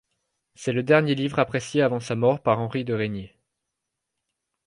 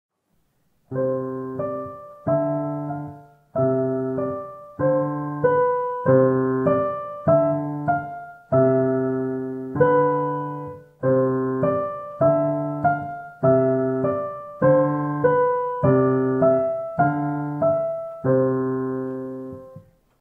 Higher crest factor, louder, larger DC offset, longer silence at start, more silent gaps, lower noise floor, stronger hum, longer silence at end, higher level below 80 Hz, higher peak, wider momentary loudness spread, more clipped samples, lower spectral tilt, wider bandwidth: about the same, 20 dB vs 18 dB; about the same, -24 LUFS vs -22 LUFS; neither; second, 0.6 s vs 0.9 s; neither; first, -82 dBFS vs -68 dBFS; neither; first, 1.4 s vs 0.4 s; about the same, -60 dBFS vs -60 dBFS; about the same, -4 dBFS vs -4 dBFS; second, 8 LU vs 13 LU; neither; second, -6.5 dB/octave vs -11.5 dB/octave; first, 11 kHz vs 3.2 kHz